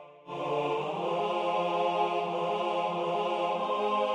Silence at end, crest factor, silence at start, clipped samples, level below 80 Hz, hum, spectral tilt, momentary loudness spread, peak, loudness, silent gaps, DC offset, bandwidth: 0 s; 16 dB; 0 s; under 0.1%; -80 dBFS; none; -5.5 dB/octave; 3 LU; -14 dBFS; -30 LUFS; none; under 0.1%; 10 kHz